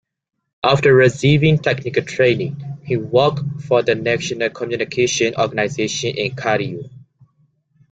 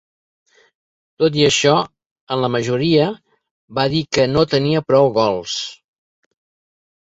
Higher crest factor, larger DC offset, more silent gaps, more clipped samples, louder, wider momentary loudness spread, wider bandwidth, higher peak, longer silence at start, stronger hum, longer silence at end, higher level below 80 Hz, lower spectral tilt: about the same, 18 dB vs 18 dB; neither; second, none vs 2.06-2.27 s, 3.51-3.68 s; neither; about the same, -17 LUFS vs -17 LUFS; about the same, 11 LU vs 11 LU; first, 9 kHz vs 8 kHz; about the same, 0 dBFS vs -2 dBFS; second, 0.65 s vs 1.2 s; neither; second, 0.95 s vs 1.3 s; about the same, -52 dBFS vs -52 dBFS; about the same, -5 dB/octave vs -5 dB/octave